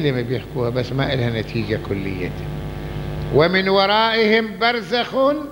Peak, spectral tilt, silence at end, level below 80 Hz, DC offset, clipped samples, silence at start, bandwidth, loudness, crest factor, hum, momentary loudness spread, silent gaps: -2 dBFS; -6.5 dB/octave; 0 s; -38 dBFS; under 0.1%; under 0.1%; 0 s; 16 kHz; -20 LUFS; 18 dB; none; 13 LU; none